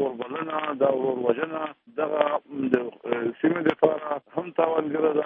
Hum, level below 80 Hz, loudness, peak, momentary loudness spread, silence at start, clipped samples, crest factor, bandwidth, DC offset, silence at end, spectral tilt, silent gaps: none; -72 dBFS; -26 LUFS; -4 dBFS; 7 LU; 0 s; under 0.1%; 20 dB; 3.8 kHz; under 0.1%; 0 s; -8.5 dB/octave; none